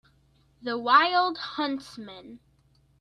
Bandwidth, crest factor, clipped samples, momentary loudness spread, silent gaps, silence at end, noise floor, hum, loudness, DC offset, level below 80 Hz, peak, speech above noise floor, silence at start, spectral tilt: 11.5 kHz; 22 dB; under 0.1%; 23 LU; none; 0.65 s; -64 dBFS; none; -24 LUFS; under 0.1%; -68 dBFS; -6 dBFS; 38 dB; 0.65 s; -3.5 dB/octave